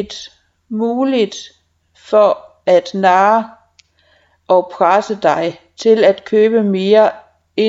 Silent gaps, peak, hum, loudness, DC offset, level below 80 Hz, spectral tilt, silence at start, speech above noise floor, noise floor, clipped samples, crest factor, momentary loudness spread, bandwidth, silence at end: none; 0 dBFS; none; -14 LUFS; under 0.1%; -60 dBFS; -5.5 dB/octave; 0 s; 42 dB; -55 dBFS; under 0.1%; 14 dB; 12 LU; 7.8 kHz; 0 s